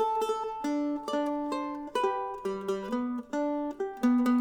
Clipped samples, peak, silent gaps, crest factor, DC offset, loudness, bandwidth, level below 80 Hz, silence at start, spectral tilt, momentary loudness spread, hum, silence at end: under 0.1%; -16 dBFS; none; 14 dB; under 0.1%; -31 LUFS; 17.5 kHz; -64 dBFS; 0 s; -5.5 dB/octave; 6 LU; none; 0 s